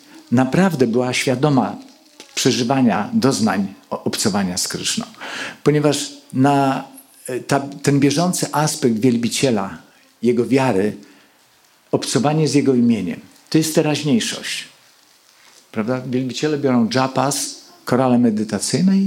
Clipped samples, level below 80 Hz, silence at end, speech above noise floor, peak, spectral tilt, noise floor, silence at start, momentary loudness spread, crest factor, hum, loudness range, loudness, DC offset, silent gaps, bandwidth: under 0.1%; -62 dBFS; 0 s; 37 dB; -2 dBFS; -5 dB/octave; -54 dBFS; 0.15 s; 12 LU; 18 dB; none; 3 LU; -18 LUFS; under 0.1%; none; 16.5 kHz